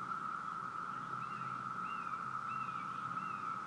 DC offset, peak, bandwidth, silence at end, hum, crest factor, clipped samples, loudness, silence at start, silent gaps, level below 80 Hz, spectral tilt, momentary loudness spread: under 0.1%; -30 dBFS; 11 kHz; 0 s; none; 12 dB; under 0.1%; -41 LUFS; 0 s; none; -82 dBFS; -5 dB/octave; 2 LU